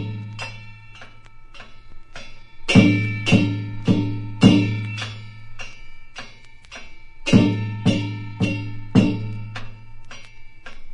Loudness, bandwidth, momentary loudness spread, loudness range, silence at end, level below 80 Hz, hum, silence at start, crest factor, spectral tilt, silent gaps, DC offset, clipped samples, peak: -20 LUFS; 10.5 kHz; 26 LU; 5 LU; 0 s; -40 dBFS; none; 0 s; 22 dB; -6.5 dB/octave; none; under 0.1%; under 0.1%; 0 dBFS